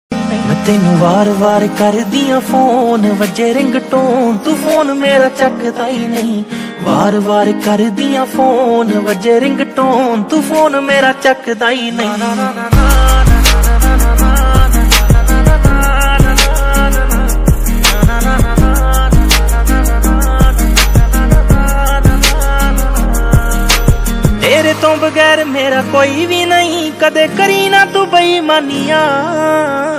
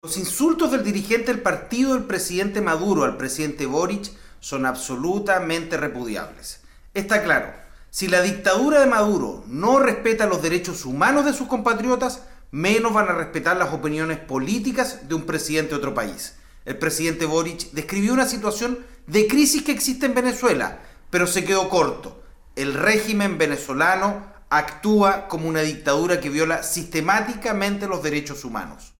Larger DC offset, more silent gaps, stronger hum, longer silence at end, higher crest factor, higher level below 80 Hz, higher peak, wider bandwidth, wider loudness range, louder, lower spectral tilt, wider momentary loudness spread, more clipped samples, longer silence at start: neither; neither; neither; about the same, 0 s vs 0.1 s; second, 10 dB vs 16 dB; first, -14 dBFS vs -46 dBFS; first, 0 dBFS vs -6 dBFS; about the same, 16 kHz vs 17.5 kHz; second, 2 LU vs 5 LU; first, -11 LUFS vs -21 LUFS; about the same, -5 dB/octave vs -4 dB/octave; second, 5 LU vs 12 LU; first, 0.7% vs under 0.1%; about the same, 0.1 s vs 0.05 s